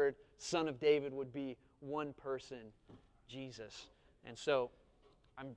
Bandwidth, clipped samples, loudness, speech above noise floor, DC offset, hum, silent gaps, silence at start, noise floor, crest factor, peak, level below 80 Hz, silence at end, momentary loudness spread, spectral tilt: 10 kHz; under 0.1%; -40 LUFS; 29 dB; under 0.1%; none; none; 0 s; -69 dBFS; 20 dB; -20 dBFS; -72 dBFS; 0 s; 21 LU; -4.5 dB/octave